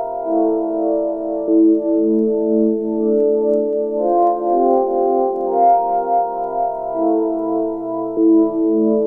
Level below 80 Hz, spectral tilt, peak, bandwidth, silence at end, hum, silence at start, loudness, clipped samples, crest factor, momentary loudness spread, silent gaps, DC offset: -54 dBFS; -12 dB/octave; -4 dBFS; 2.2 kHz; 0 s; none; 0 s; -17 LUFS; under 0.1%; 12 dB; 7 LU; none; under 0.1%